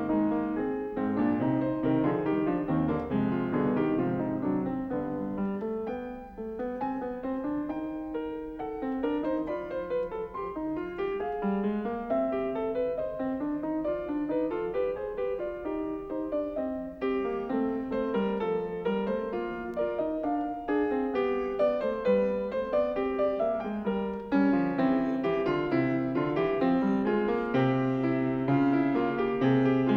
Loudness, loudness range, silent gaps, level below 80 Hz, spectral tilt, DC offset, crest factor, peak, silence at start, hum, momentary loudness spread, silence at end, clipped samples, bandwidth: -30 LUFS; 6 LU; none; -54 dBFS; -9.5 dB/octave; under 0.1%; 16 dB; -14 dBFS; 0 s; none; 8 LU; 0 s; under 0.1%; 5.8 kHz